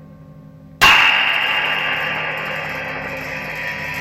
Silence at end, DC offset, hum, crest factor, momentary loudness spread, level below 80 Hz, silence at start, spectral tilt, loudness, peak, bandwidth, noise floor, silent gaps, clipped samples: 0 s; under 0.1%; none; 18 dB; 15 LU; -46 dBFS; 0 s; -2 dB/octave; -16 LUFS; -2 dBFS; 16.5 kHz; -40 dBFS; none; under 0.1%